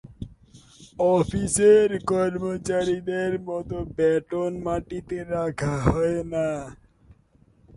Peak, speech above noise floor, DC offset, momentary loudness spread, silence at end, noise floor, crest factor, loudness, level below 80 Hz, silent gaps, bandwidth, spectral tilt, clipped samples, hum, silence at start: -2 dBFS; 36 dB; under 0.1%; 14 LU; 0 s; -59 dBFS; 22 dB; -24 LUFS; -44 dBFS; none; 11.5 kHz; -6 dB/octave; under 0.1%; none; 0.05 s